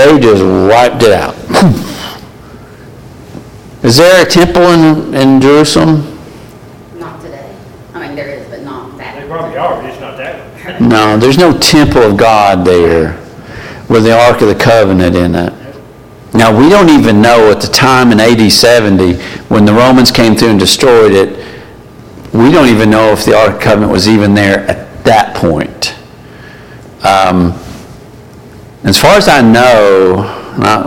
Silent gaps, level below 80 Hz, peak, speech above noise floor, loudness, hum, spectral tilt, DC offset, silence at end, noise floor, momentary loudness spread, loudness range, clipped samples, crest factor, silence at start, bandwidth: none; -32 dBFS; 0 dBFS; 27 dB; -6 LUFS; none; -5 dB/octave; under 0.1%; 0 s; -32 dBFS; 20 LU; 9 LU; 0.3%; 8 dB; 0 s; 17.5 kHz